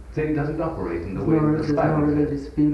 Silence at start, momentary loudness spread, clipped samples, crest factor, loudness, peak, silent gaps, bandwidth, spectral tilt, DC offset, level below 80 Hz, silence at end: 0 s; 7 LU; under 0.1%; 14 dB; -23 LUFS; -8 dBFS; none; 6.4 kHz; -9.5 dB/octave; under 0.1%; -40 dBFS; 0 s